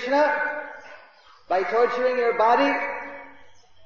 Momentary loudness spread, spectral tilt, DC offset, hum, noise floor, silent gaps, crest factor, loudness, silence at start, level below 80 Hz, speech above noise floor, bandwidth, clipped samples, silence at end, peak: 19 LU; -4 dB/octave; 0.3%; none; -53 dBFS; none; 16 dB; -22 LUFS; 0 s; -68 dBFS; 32 dB; 7.2 kHz; under 0.1%; 0.55 s; -8 dBFS